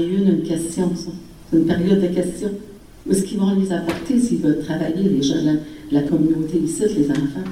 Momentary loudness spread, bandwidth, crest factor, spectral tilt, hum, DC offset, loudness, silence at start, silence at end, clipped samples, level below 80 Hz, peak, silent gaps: 7 LU; 14.5 kHz; 14 dB; -6.5 dB/octave; none; 0.3%; -20 LUFS; 0 s; 0 s; under 0.1%; -46 dBFS; -4 dBFS; none